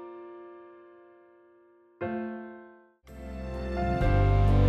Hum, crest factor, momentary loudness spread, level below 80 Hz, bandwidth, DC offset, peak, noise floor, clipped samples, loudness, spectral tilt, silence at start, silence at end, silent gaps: none; 16 dB; 25 LU; -34 dBFS; 6 kHz; under 0.1%; -12 dBFS; -60 dBFS; under 0.1%; -29 LUFS; -9 dB/octave; 0 s; 0 s; none